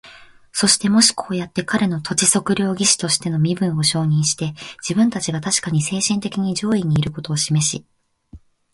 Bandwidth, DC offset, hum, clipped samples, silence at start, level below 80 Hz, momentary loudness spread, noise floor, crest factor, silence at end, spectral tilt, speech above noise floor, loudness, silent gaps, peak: 11.5 kHz; under 0.1%; none; under 0.1%; 0.05 s; -52 dBFS; 9 LU; -45 dBFS; 18 dB; 0.35 s; -3.5 dB/octave; 26 dB; -18 LUFS; none; -2 dBFS